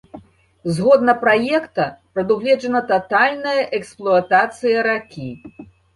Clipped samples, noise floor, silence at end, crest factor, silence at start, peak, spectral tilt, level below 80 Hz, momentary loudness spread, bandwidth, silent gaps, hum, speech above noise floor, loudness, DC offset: under 0.1%; -42 dBFS; 0.3 s; 16 dB; 0.15 s; -2 dBFS; -6 dB/octave; -58 dBFS; 11 LU; 11.5 kHz; none; none; 24 dB; -17 LUFS; under 0.1%